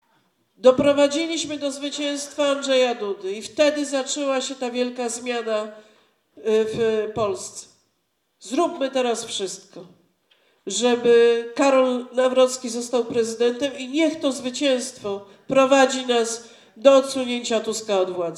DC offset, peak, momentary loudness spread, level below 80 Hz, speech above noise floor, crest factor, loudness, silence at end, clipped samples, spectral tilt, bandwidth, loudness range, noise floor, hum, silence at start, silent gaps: under 0.1%; 0 dBFS; 12 LU; -64 dBFS; 50 dB; 22 dB; -21 LUFS; 0 s; under 0.1%; -3 dB/octave; 13 kHz; 6 LU; -72 dBFS; none; 0.65 s; none